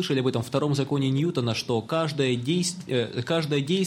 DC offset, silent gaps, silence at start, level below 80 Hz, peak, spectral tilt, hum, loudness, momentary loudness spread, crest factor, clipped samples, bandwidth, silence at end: under 0.1%; none; 0 s; -64 dBFS; -10 dBFS; -5.5 dB/octave; none; -26 LUFS; 3 LU; 16 dB; under 0.1%; 16 kHz; 0 s